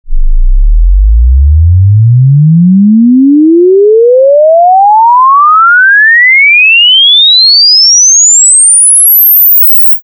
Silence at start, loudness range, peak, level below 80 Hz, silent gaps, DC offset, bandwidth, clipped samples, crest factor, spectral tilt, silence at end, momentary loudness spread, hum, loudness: 0.05 s; 5 LU; 0 dBFS; -12 dBFS; none; under 0.1%; 11.5 kHz; 0.3%; 4 dB; -3 dB/octave; 0.05 s; 7 LU; none; -2 LUFS